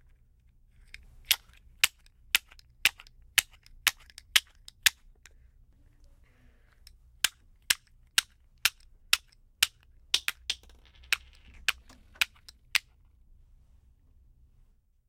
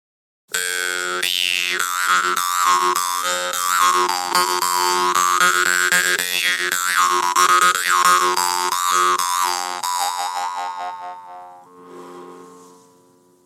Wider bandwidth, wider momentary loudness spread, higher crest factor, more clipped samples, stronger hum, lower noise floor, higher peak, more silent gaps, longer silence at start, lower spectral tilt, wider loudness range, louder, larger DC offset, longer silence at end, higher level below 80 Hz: second, 16.5 kHz vs 19 kHz; second, 6 LU vs 10 LU; first, 34 dB vs 18 dB; neither; neither; first, -63 dBFS vs -54 dBFS; about the same, 0 dBFS vs -2 dBFS; neither; first, 1.3 s vs 0.5 s; second, 2.5 dB/octave vs 0.5 dB/octave; second, 5 LU vs 9 LU; second, -29 LUFS vs -17 LUFS; neither; first, 2.3 s vs 0.85 s; first, -58 dBFS vs -78 dBFS